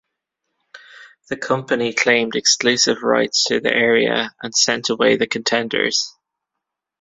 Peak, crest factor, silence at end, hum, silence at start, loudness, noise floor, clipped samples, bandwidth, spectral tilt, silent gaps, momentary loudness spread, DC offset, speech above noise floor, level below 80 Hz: 0 dBFS; 20 dB; 0.9 s; none; 0.75 s; -17 LUFS; -82 dBFS; under 0.1%; 8 kHz; -2 dB/octave; none; 7 LU; under 0.1%; 63 dB; -60 dBFS